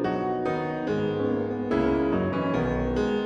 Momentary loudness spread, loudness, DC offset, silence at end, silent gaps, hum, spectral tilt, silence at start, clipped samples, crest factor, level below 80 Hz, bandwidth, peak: 4 LU; -26 LUFS; under 0.1%; 0 s; none; none; -8 dB/octave; 0 s; under 0.1%; 14 dB; -42 dBFS; 8 kHz; -12 dBFS